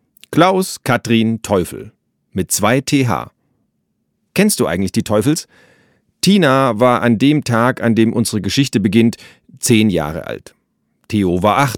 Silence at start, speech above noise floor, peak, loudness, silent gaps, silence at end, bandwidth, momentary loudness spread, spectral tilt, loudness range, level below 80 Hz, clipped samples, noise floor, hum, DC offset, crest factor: 0.3 s; 53 dB; 0 dBFS; -15 LUFS; none; 0 s; 18 kHz; 10 LU; -5 dB/octave; 4 LU; -48 dBFS; under 0.1%; -68 dBFS; none; under 0.1%; 16 dB